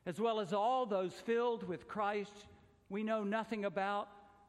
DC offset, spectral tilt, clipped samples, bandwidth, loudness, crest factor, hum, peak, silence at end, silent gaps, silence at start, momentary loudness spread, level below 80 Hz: under 0.1%; -6 dB/octave; under 0.1%; 12.5 kHz; -38 LUFS; 16 dB; none; -22 dBFS; 0.25 s; none; 0.05 s; 9 LU; -76 dBFS